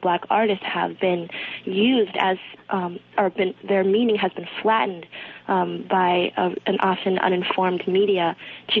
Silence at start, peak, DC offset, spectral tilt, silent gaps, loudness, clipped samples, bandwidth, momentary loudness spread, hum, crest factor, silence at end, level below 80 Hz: 0 s; -4 dBFS; under 0.1%; -8 dB/octave; none; -22 LUFS; under 0.1%; 4.7 kHz; 8 LU; none; 18 dB; 0 s; -68 dBFS